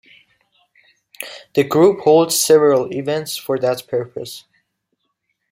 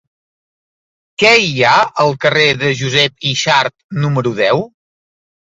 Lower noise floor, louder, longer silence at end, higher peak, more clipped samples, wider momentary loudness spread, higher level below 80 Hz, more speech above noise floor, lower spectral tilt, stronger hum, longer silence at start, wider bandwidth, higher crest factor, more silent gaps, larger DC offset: second, -72 dBFS vs under -90 dBFS; second, -16 LUFS vs -12 LUFS; first, 1.15 s vs 0.95 s; about the same, -2 dBFS vs 0 dBFS; neither; first, 19 LU vs 9 LU; second, -64 dBFS vs -54 dBFS; second, 56 dB vs over 77 dB; about the same, -4 dB/octave vs -4 dB/octave; neither; about the same, 1.2 s vs 1.2 s; first, 16.5 kHz vs 8 kHz; about the same, 16 dB vs 16 dB; second, none vs 3.84-3.89 s; neither